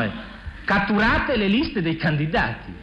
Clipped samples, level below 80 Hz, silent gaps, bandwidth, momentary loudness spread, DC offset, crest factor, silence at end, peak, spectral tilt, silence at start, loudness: under 0.1%; -38 dBFS; none; 7.6 kHz; 11 LU; under 0.1%; 12 dB; 0 s; -10 dBFS; -7.5 dB/octave; 0 s; -21 LUFS